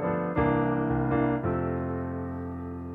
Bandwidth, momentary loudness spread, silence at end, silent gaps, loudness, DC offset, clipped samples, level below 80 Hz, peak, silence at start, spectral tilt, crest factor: 3.8 kHz; 10 LU; 0 s; none; -28 LUFS; under 0.1%; under 0.1%; -46 dBFS; -12 dBFS; 0 s; -11 dB/octave; 16 dB